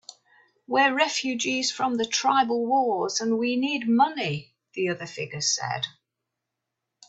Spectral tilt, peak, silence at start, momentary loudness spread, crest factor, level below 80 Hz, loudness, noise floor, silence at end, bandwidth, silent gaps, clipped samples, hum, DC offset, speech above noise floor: -3 dB/octave; -8 dBFS; 0.7 s; 9 LU; 18 dB; -72 dBFS; -25 LUFS; -84 dBFS; 1.2 s; 8.4 kHz; none; under 0.1%; none; under 0.1%; 59 dB